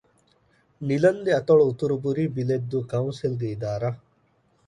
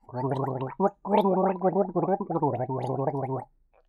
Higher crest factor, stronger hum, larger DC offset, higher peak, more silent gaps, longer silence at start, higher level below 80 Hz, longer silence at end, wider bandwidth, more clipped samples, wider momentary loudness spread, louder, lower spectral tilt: about the same, 18 dB vs 18 dB; neither; neither; first, -6 dBFS vs -10 dBFS; neither; first, 0.8 s vs 0.1 s; about the same, -60 dBFS vs -64 dBFS; first, 0.7 s vs 0.45 s; second, 10 kHz vs 13.5 kHz; neither; first, 10 LU vs 7 LU; first, -24 LUFS vs -27 LUFS; second, -8 dB/octave vs -10 dB/octave